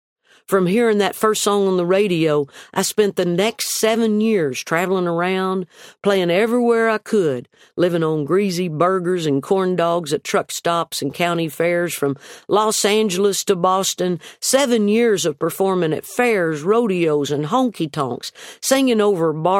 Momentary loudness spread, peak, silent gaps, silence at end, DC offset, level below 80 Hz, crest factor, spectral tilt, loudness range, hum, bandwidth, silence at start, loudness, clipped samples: 6 LU; -2 dBFS; none; 0 s; under 0.1%; -66 dBFS; 18 dB; -4.5 dB/octave; 2 LU; none; 16.5 kHz; 0.5 s; -18 LUFS; under 0.1%